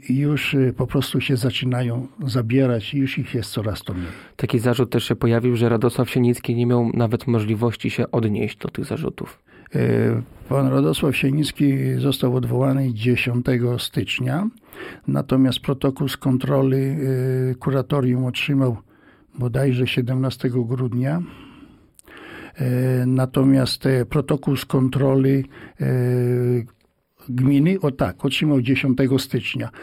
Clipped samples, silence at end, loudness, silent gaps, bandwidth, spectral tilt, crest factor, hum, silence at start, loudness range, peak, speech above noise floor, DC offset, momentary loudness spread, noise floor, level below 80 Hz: under 0.1%; 0 s; -21 LUFS; none; 15.5 kHz; -7 dB/octave; 14 dB; none; 0.05 s; 3 LU; -8 dBFS; 35 dB; under 0.1%; 9 LU; -55 dBFS; -48 dBFS